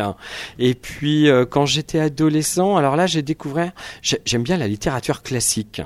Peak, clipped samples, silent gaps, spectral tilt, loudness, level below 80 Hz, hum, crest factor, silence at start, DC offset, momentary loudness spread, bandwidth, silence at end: -2 dBFS; under 0.1%; none; -4.5 dB/octave; -19 LUFS; -46 dBFS; none; 16 dB; 0 s; under 0.1%; 8 LU; 14.5 kHz; 0 s